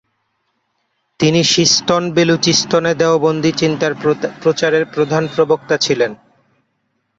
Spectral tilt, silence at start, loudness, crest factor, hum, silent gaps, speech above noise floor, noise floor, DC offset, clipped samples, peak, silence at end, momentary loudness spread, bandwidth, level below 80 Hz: -4 dB/octave; 1.2 s; -14 LUFS; 14 dB; none; none; 53 dB; -67 dBFS; under 0.1%; under 0.1%; -2 dBFS; 1.05 s; 6 LU; 8 kHz; -54 dBFS